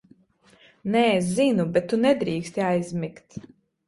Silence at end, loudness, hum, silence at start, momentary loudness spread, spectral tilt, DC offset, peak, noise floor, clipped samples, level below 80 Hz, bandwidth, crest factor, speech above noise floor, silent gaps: 0.45 s; -23 LUFS; none; 0.85 s; 16 LU; -6 dB/octave; under 0.1%; -6 dBFS; -58 dBFS; under 0.1%; -60 dBFS; 11.5 kHz; 18 dB; 35 dB; none